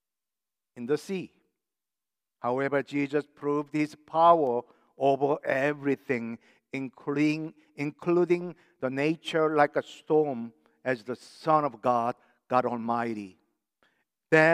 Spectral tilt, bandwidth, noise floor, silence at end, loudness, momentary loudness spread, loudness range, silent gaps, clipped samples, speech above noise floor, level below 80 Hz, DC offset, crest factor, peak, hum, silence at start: -6.5 dB/octave; 12 kHz; under -90 dBFS; 0 s; -28 LUFS; 14 LU; 5 LU; none; under 0.1%; over 62 dB; -82 dBFS; under 0.1%; 22 dB; -6 dBFS; none; 0.75 s